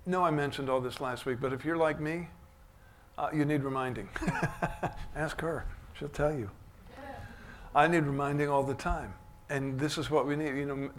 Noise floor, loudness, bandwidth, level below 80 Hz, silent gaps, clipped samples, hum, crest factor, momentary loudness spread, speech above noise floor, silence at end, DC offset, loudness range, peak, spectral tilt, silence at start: -57 dBFS; -32 LUFS; 16 kHz; -48 dBFS; none; under 0.1%; none; 22 dB; 17 LU; 25 dB; 0 s; under 0.1%; 5 LU; -10 dBFS; -6.5 dB/octave; 0 s